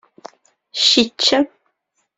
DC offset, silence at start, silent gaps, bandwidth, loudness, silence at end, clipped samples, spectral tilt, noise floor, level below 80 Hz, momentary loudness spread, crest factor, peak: under 0.1%; 0.75 s; none; 8.4 kHz; -15 LUFS; 0.7 s; under 0.1%; -1.5 dB/octave; -70 dBFS; -58 dBFS; 12 LU; 20 dB; 0 dBFS